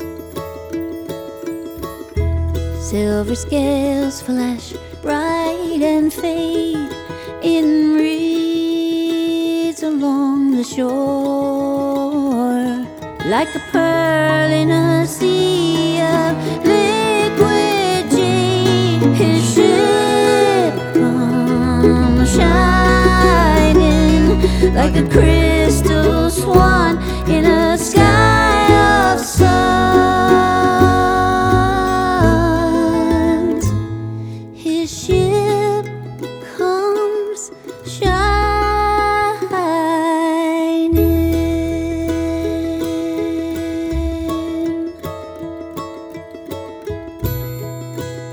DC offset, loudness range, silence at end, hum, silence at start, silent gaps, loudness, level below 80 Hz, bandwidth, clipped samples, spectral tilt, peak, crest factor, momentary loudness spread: under 0.1%; 8 LU; 0 s; none; 0 s; none; -15 LUFS; -26 dBFS; over 20 kHz; under 0.1%; -5.5 dB/octave; 0 dBFS; 14 dB; 15 LU